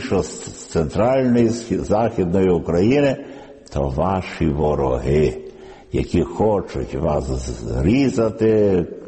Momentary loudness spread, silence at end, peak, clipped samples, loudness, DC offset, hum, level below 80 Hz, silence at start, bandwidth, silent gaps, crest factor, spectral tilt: 10 LU; 0 s; -6 dBFS; under 0.1%; -19 LUFS; under 0.1%; none; -34 dBFS; 0 s; 8.8 kHz; none; 14 dB; -7 dB/octave